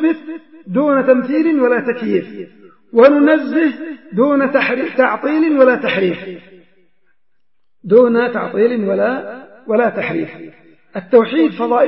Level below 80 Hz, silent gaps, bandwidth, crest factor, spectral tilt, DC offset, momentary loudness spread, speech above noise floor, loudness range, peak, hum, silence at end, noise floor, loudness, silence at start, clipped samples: -68 dBFS; none; 5.8 kHz; 16 dB; -10 dB/octave; 0.3%; 18 LU; 61 dB; 3 LU; 0 dBFS; none; 0 s; -75 dBFS; -14 LUFS; 0 s; under 0.1%